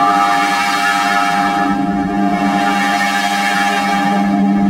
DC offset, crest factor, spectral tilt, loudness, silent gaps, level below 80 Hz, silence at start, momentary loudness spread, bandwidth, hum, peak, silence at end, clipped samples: under 0.1%; 12 dB; -4.5 dB/octave; -14 LUFS; none; -44 dBFS; 0 s; 3 LU; 16 kHz; none; -2 dBFS; 0 s; under 0.1%